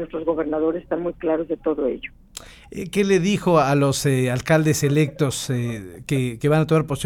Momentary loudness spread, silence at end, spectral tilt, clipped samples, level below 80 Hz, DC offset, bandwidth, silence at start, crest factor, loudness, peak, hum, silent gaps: 15 LU; 0 s; -6 dB/octave; under 0.1%; -48 dBFS; under 0.1%; 17 kHz; 0 s; 16 dB; -21 LUFS; -4 dBFS; none; none